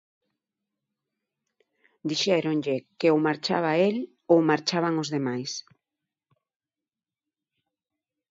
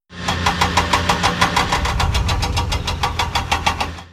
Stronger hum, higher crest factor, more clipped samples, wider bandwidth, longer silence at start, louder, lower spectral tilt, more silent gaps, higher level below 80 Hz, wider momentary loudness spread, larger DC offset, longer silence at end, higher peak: neither; about the same, 22 dB vs 18 dB; neither; second, 7.8 kHz vs 15.5 kHz; first, 2.05 s vs 0.1 s; second, -25 LUFS vs -18 LUFS; first, -5 dB/octave vs -3.5 dB/octave; neither; second, -78 dBFS vs -26 dBFS; first, 11 LU vs 5 LU; neither; first, 2.7 s vs 0.05 s; second, -6 dBFS vs -2 dBFS